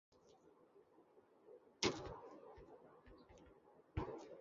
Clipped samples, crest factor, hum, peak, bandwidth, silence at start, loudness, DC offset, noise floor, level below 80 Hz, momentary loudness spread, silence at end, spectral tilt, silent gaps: under 0.1%; 32 dB; none; -20 dBFS; 7.2 kHz; 0.1 s; -46 LUFS; under 0.1%; -70 dBFS; -64 dBFS; 28 LU; 0 s; -3.5 dB/octave; none